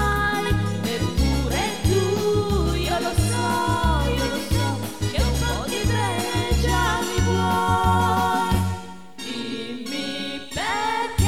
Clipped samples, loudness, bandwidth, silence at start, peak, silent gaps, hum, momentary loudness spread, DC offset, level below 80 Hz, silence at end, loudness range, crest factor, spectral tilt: under 0.1%; -23 LUFS; 16.5 kHz; 0 s; -6 dBFS; none; none; 8 LU; 0.9%; -30 dBFS; 0 s; 2 LU; 16 dB; -5 dB/octave